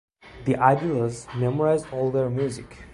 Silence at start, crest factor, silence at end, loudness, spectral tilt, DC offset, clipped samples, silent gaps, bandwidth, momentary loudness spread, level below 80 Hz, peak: 0.25 s; 22 dB; 0 s; -24 LUFS; -7.5 dB/octave; under 0.1%; under 0.1%; none; 11.5 kHz; 9 LU; -52 dBFS; -4 dBFS